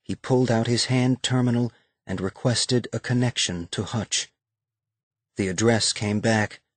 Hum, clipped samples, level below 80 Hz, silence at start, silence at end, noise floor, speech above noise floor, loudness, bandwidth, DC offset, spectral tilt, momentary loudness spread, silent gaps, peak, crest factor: none; under 0.1%; -58 dBFS; 0.1 s; 0.2 s; -88 dBFS; 65 dB; -24 LUFS; 9.4 kHz; under 0.1%; -4.5 dB/octave; 9 LU; 5.03-5.11 s; -8 dBFS; 18 dB